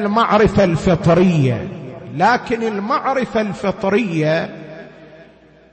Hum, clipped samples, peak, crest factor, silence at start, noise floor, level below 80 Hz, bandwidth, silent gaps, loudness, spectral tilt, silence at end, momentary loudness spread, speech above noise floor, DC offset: none; under 0.1%; -4 dBFS; 12 dB; 0 s; -46 dBFS; -40 dBFS; 8.6 kHz; none; -16 LUFS; -7 dB/octave; 0.5 s; 16 LU; 30 dB; under 0.1%